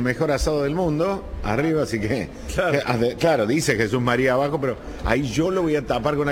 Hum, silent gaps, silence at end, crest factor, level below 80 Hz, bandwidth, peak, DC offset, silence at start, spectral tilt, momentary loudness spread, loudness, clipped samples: none; none; 0 s; 16 dB; -36 dBFS; 17 kHz; -4 dBFS; under 0.1%; 0 s; -5.5 dB/octave; 6 LU; -22 LUFS; under 0.1%